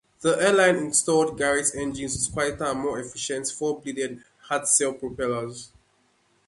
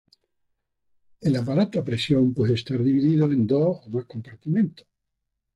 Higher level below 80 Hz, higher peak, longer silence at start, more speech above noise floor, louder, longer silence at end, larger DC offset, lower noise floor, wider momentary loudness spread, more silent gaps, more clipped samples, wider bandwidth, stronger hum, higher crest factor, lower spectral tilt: first, -54 dBFS vs -60 dBFS; first, -6 dBFS vs -10 dBFS; second, 0.2 s vs 1.2 s; second, 41 dB vs 58 dB; about the same, -24 LUFS vs -23 LUFS; about the same, 0.8 s vs 0.85 s; neither; second, -66 dBFS vs -80 dBFS; about the same, 11 LU vs 10 LU; neither; neither; about the same, 12 kHz vs 11 kHz; neither; about the same, 18 dB vs 14 dB; second, -3 dB/octave vs -8 dB/octave